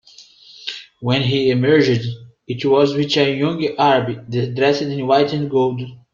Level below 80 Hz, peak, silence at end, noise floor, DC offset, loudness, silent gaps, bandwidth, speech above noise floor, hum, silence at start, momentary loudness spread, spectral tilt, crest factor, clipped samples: -56 dBFS; -2 dBFS; 0.2 s; -45 dBFS; under 0.1%; -17 LUFS; none; 7.4 kHz; 28 dB; none; 0.2 s; 15 LU; -6.5 dB/octave; 16 dB; under 0.1%